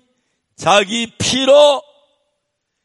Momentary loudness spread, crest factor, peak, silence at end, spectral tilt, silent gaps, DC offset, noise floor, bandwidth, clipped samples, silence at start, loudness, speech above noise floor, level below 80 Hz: 11 LU; 16 dB; 0 dBFS; 1.05 s; -3 dB/octave; none; under 0.1%; -73 dBFS; 11.5 kHz; under 0.1%; 0.6 s; -13 LUFS; 60 dB; -52 dBFS